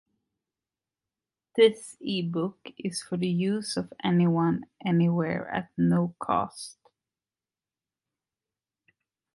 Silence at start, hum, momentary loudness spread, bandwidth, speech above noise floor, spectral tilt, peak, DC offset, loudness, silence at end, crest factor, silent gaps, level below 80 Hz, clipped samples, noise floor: 1.55 s; none; 12 LU; 11.5 kHz; over 64 dB; -6.5 dB/octave; -8 dBFS; under 0.1%; -27 LUFS; 2.65 s; 20 dB; none; -66 dBFS; under 0.1%; under -90 dBFS